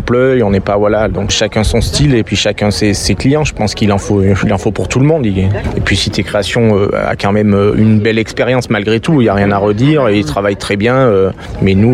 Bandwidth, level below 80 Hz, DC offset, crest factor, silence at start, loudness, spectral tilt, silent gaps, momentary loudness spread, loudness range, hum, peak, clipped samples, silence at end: 13.5 kHz; -28 dBFS; under 0.1%; 10 dB; 0 s; -12 LUFS; -5.5 dB/octave; none; 4 LU; 1 LU; none; 0 dBFS; under 0.1%; 0 s